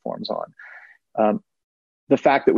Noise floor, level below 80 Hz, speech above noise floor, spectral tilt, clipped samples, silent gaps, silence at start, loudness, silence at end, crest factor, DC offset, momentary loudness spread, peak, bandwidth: -46 dBFS; -66 dBFS; 27 dB; -7 dB/octave; under 0.1%; 1.64-2.07 s; 0.05 s; -22 LUFS; 0 s; 18 dB; under 0.1%; 21 LU; -4 dBFS; 7.2 kHz